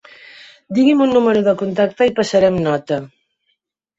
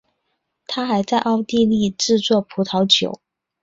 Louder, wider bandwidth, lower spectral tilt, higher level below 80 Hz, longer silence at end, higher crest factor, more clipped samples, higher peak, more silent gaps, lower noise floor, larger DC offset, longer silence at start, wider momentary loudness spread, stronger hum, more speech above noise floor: about the same, -16 LUFS vs -18 LUFS; about the same, 8 kHz vs 7.8 kHz; first, -6.5 dB/octave vs -4.5 dB/octave; about the same, -54 dBFS vs -56 dBFS; first, 0.95 s vs 0.45 s; about the same, 14 dB vs 18 dB; neither; about the same, -2 dBFS vs -2 dBFS; neither; second, -69 dBFS vs -73 dBFS; neither; about the same, 0.7 s vs 0.7 s; about the same, 8 LU vs 10 LU; neither; about the same, 55 dB vs 55 dB